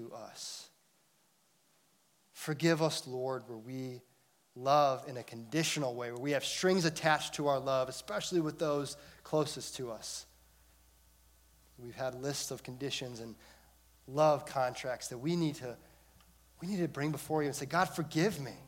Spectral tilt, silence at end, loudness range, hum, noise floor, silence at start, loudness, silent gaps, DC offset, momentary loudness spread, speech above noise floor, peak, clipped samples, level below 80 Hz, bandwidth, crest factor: -4.5 dB/octave; 0 s; 9 LU; none; -72 dBFS; 0 s; -35 LUFS; none; under 0.1%; 15 LU; 37 dB; -14 dBFS; under 0.1%; -68 dBFS; 16.5 kHz; 22 dB